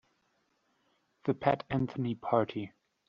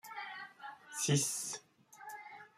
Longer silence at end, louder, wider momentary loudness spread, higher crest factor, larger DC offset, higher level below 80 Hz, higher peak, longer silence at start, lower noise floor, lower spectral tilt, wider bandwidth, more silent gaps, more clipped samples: first, 0.4 s vs 0.1 s; first, -33 LUFS vs -37 LUFS; second, 9 LU vs 18 LU; about the same, 24 dB vs 22 dB; neither; first, -66 dBFS vs -78 dBFS; first, -12 dBFS vs -20 dBFS; first, 1.25 s vs 0.05 s; first, -75 dBFS vs -59 dBFS; first, -6.5 dB/octave vs -3.5 dB/octave; second, 6.8 kHz vs 15.5 kHz; neither; neither